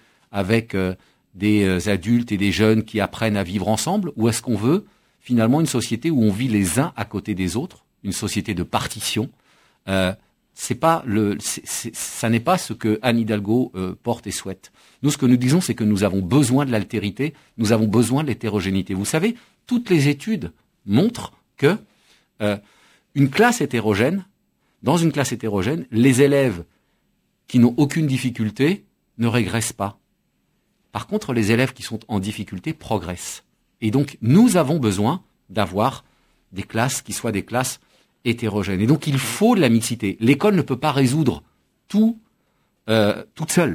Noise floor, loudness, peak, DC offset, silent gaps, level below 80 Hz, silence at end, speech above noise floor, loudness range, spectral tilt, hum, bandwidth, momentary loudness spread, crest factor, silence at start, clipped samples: -68 dBFS; -21 LUFS; 0 dBFS; under 0.1%; none; -46 dBFS; 0 s; 48 dB; 5 LU; -5.5 dB/octave; none; 16 kHz; 12 LU; 20 dB; 0.35 s; under 0.1%